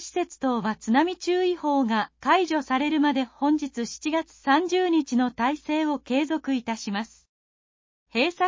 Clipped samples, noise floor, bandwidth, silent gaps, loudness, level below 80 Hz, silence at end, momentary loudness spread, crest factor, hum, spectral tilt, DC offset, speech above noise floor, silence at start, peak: under 0.1%; under -90 dBFS; 7.6 kHz; 7.29-8.06 s; -25 LUFS; -64 dBFS; 0 s; 7 LU; 16 dB; none; -4 dB/octave; under 0.1%; over 66 dB; 0 s; -8 dBFS